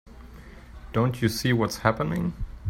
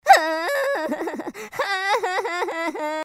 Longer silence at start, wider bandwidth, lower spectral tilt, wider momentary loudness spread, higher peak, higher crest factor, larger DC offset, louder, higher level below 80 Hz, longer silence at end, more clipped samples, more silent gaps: about the same, 0.05 s vs 0.05 s; about the same, 16 kHz vs 16 kHz; first, -6 dB/octave vs -1.5 dB/octave; first, 23 LU vs 11 LU; second, -4 dBFS vs 0 dBFS; about the same, 22 dB vs 22 dB; neither; second, -26 LUFS vs -23 LUFS; first, -42 dBFS vs -74 dBFS; about the same, 0 s vs 0 s; neither; neither